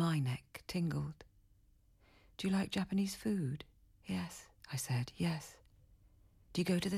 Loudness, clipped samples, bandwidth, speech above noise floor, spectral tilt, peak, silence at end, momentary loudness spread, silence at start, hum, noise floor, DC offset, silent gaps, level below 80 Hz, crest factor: -39 LUFS; under 0.1%; 16 kHz; 31 dB; -5.5 dB/octave; -24 dBFS; 0 s; 17 LU; 0 s; none; -68 dBFS; under 0.1%; none; -64 dBFS; 16 dB